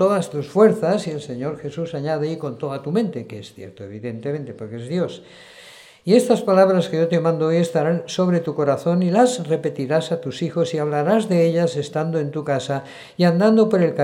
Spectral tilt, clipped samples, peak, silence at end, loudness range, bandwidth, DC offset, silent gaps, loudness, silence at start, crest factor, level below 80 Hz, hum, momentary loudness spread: -6.5 dB/octave; under 0.1%; -2 dBFS; 0 s; 8 LU; 12.5 kHz; under 0.1%; none; -20 LUFS; 0 s; 18 dB; -66 dBFS; none; 14 LU